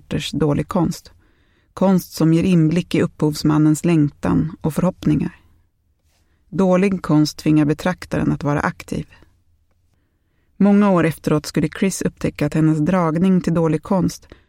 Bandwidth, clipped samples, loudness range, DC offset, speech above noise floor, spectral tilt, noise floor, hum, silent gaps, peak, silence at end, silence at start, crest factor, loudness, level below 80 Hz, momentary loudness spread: 16.5 kHz; under 0.1%; 3 LU; under 0.1%; 46 dB; -7 dB/octave; -63 dBFS; none; none; -4 dBFS; 0.3 s; 0.1 s; 16 dB; -18 LUFS; -44 dBFS; 7 LU